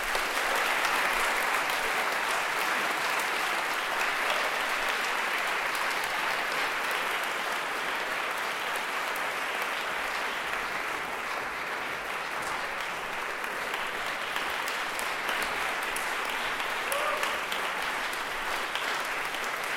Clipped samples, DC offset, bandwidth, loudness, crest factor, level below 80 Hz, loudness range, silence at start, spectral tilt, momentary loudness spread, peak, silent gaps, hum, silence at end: under 0.1%; under 0.1%; 16.5 kHz; -29 LUFS; 20 dB; -58 dBFS; 5 LU; 0 s; -0.5 dB/octave; 5 LU; -10 dBFS; none; none; 0 s